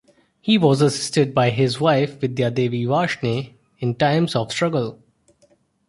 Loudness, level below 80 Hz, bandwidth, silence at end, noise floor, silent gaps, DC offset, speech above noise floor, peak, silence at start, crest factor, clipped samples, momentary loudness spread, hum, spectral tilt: -20 LUFS; -58 dBFS; 11.5 kHz; 0.95 s; -60 dBFS; none; under 0.1%; 41 dB; -2 dBFS; 0.45 s; 18 dB; under 0.1%; 10 LU; none; -6 dB/octave